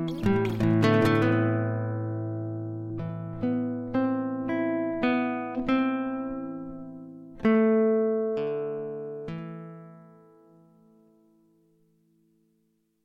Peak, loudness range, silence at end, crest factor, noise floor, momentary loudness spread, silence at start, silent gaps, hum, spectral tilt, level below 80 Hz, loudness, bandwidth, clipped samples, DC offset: -8 dBFS; 12 LU; 3 s; 20 dB; -71 dBFS; 16 LU; 0 s; none; none; -8.5 dB/octave; -56 dBFS; -27 LUFS; 12 kHz; under 0.1%; under 0.1%